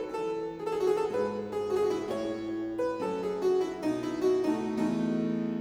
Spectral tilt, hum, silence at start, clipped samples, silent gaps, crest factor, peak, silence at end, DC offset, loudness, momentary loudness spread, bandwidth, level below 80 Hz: -6.5 dB/octave; none; 0 s; under 0.1%; none; 12 dB; -18 dBFS; 0 s; under 0.1%; -31 LUFS; 5 LU; 14 kHz; -64 dBFS